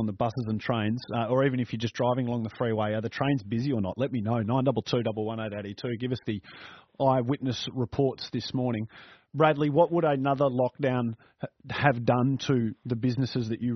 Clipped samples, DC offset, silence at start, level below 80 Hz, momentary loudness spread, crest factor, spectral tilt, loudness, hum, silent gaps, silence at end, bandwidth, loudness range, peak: under 0.1%; under 0.1%; 0 s; -62 dBFS; 10 LU; 22 dB; -6 dB/octave; -28 LUFS; none; none; 0 s; 6.4 kHz; 4 LU; -4 dBFS